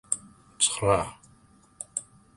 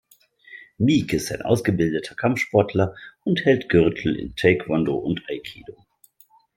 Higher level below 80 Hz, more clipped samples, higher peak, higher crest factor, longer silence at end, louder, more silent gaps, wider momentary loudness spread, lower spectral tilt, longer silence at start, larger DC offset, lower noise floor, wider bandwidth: about the same, -52 dBFS vs -52 dBFS; neither; second, -8 dBFS vs -2 dBFS; about the same, 24 dB vs 20 dB; second, 0.35 s vs 0.85 s; second, -27 LUFS vs -22 LUFS; neither; first, 14 LU vs 10 LU; second, -2.5 dB/octave vs -6 dB/octave; second, 0.1 s vs 0.5 s; neither; about the same, -58 dBFS vs -57 dBFS; second, 11.5 kHz vs 16.5 kHz